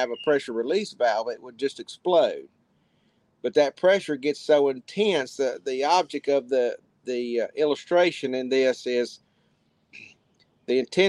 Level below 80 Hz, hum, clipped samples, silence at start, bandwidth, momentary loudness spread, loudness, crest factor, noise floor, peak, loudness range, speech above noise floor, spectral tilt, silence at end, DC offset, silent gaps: -78 dBFS; none; under 0.1%; 0 s; 11 kHz; 9 LU; -25 LUFS; 18 dB; -67 dBFS; -8 dBFS; 3 LU; 43 dB; -4 dB/octave; 0 s; under 0.1%; none